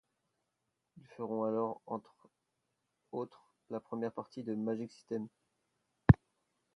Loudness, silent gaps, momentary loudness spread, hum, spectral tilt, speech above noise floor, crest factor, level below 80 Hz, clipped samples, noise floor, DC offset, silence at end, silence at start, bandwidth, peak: -36 LUFS; none; 18 LU; none; -10 dB/octave; 46 dB; 30 dB; -50 dBFS; under 0.1%; -85 dBFS; under 0.1%; 0.6 s; 1.2 s; 7.8 kHz; -8 dBFS